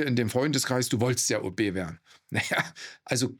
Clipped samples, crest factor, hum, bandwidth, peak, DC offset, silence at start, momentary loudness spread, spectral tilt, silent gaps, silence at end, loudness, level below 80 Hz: under 0.1%; 18 dB; none; 18.5 kHz; -10 dBFS; under 0.1%; 0 s; 10 LU; -4 dB/octave; none; 0.05 s; -27 LUFS; -66 dBFS